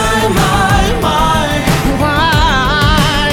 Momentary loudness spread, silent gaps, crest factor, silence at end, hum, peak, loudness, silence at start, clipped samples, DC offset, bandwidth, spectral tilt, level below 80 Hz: 3 LU; none; 10 dB; 0 s; none; 0 dBFS; -11 LUFS; 0 s; under 0.1%; under 0.1%; 19 kHz; -4.5 dB/octave; -20 dBFS